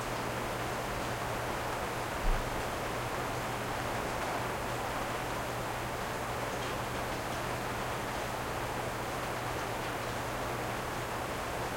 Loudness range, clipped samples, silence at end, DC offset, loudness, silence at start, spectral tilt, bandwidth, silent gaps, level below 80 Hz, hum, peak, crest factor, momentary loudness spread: 1 LU; under 0.1%; 0 s; under 0.1%; -35 LUFS; 0 s; -4 dB/octave; 16.5 kHz; none; -46 dBFS; none; -18 dBFS; 16 dB; 1 LU